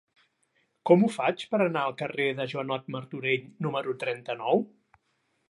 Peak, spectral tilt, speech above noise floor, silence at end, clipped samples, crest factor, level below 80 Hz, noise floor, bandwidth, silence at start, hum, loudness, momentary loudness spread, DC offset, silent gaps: -8 dBFS; -6.5 dB/octave; 47 dB; 0.85 s; under 0.1%; 22 dB; -80 dBFS; -74 dBFS; 11.5 kHz; 0.85 s; none; -28 LUFS; 11 LU; under 0.1%; none